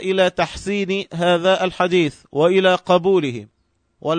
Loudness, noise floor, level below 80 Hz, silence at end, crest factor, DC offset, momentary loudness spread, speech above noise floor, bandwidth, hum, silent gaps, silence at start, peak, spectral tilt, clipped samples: -18 LUFS; -40 dBFS; -50 dBFS; 0 s; 16 dB; under 0.1%; 8 LU; 22 dB; 9.6 kHz; none; none; 0 s; -2 dBFS; -5.5 dB/octave; under 0.1%